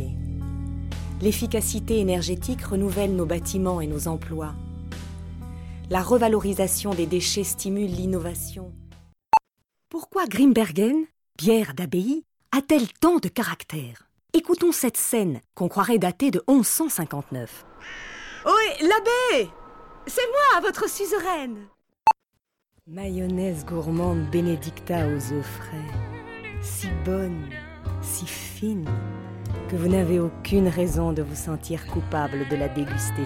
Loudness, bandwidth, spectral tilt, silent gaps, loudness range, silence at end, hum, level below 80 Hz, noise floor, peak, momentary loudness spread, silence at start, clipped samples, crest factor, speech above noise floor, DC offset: -24 LUFS; 17.5 kHz; -5 dB/octave; none; 6 LU; 0 s; none; -40 dBFS; -77 dBFS; -6 dBFS; 16 LU; 0 s; under 0.1%; 18 dB; 53 dB; under 0.1%